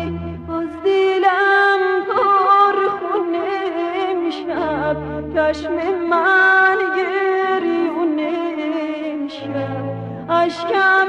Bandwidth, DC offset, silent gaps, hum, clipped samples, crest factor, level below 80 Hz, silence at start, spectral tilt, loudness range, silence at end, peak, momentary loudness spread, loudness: 8.4 kHz; under 0.1%; none; none; under 0.1%; 14 dB; -48 dBFS; 0 s; -6 dB/octave; 5 LU; 0 s; -4 dBFS; 12 LU; -17 LUFS